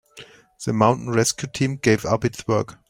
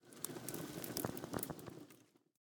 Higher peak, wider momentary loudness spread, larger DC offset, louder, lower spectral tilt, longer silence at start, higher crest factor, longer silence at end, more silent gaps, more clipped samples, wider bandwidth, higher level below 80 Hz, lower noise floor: first, -2 dBFS vs -18 dBFS; second, 6 LU vs 15 LU; neither; first, -21 LUFS vs -45 LUFS; about the same, -5 dB/octave vs -4 dB/octave; about the same, 0.15 s vs 0.05 s; second, 20 dB vs 30 dB; second, 0.15 s vs 0.35 s; neither; neither; second, 16 kHz vs over 20 kHz; first, -52 dBFS vs -72 dBFS; second, -46 dBFS vs -67 dBFS